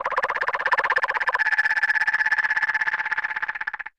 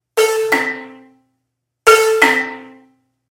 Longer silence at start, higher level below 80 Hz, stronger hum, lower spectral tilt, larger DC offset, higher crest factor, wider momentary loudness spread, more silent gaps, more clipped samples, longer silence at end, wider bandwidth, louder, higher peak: second, 0 s vs 0.15 s; second, -62 dBFS vs -56 dBFS; neither; about the same, -1 dB/octave vs -1 dB/octave; neither; about the same, 14 dB vs 18 dB; second, 6 LU vs 16 LU; neither; neither; second, 0.1 s vs 0.65 s; second, 10.5 kHz vs 17 kHz; second, -22 LUFS vs -13 LUFS; second, -8 dBFS vs 0 dBFS